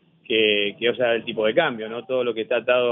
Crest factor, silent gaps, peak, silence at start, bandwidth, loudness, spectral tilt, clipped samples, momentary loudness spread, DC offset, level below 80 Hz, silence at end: 18 dB; none; -4 dBFS; 0.3 s; 3.9 kHz; -22 LUFS; -7.5 dB/octave; under 0.1%; 6 LU; under 0.1%; -72 dBFS; 0 s